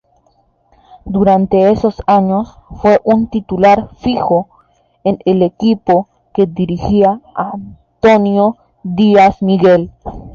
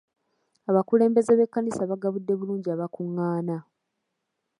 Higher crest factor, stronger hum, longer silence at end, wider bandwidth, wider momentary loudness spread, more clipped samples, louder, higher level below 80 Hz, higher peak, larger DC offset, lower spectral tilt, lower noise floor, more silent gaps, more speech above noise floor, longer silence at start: second, 12 dB vs 18 dB; neither; second, 0 s vs 1 s; second, 7.2 kHz vs 11 kHz; about the same, 12 LU vs 11 LU; neither; first, -13 LUFS vs -25 LUFS; first, -38 dBFS vs -74 dBFS; first, -2 dBFS vs -8 dBFS; neither; about the same, -8 dB/octave vs -8.5 dB/octave; second, -55 dBFS vs -80 dBFS; neither; second, 44 dB vs 56 dB; first, 1.05 s vs 0.7 s